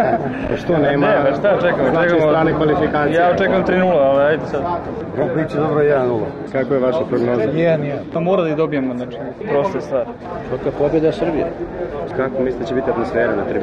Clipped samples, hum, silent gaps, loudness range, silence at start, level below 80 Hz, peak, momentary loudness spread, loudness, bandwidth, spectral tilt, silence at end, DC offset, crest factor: under 0.1%; none; none; 5 LU; 0 s; -42 dBFS; -6 dBFS; 9 LU; -17 LUFS; 8 kHz; -8 dB/octave; 0 s; under 0.1%; 10 dB